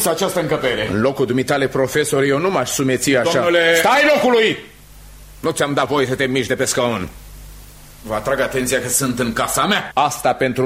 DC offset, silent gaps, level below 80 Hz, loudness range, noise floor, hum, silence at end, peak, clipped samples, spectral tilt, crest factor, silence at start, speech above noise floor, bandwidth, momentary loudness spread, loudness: under 0.1%; none; -44 dBFS; 5 LU; -40 dBFS; none; 0 s; -2 dBFS; under 0.1%; -3.5 dB/octave; 16 dB; 0 s; 23 dB; 16 kHz; 8 LU; -17 LUFS